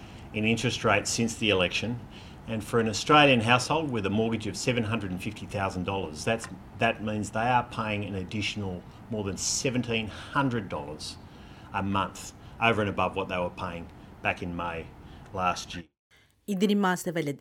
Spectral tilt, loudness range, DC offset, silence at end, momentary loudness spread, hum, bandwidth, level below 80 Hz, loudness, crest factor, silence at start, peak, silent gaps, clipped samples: -4.5 dB/octave; 6 LU; under 0.1%; 0 s; 15 LU; none; 16.5 kHz; -52 dBFS; -28 LUFS; 22 dB; 0 s; -6 dBFS; 15.99-16.10 s; under 0.1%